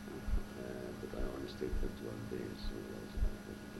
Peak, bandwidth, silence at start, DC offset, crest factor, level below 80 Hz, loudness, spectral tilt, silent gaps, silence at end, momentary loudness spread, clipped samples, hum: -24 dBFS; 15.5 kHz; 0 s; under 0.1%; 16 dB; -42 dBFS; -44 LUFS; -6 dB/octave; none; 0 s; 4 LU; under 0.1%; none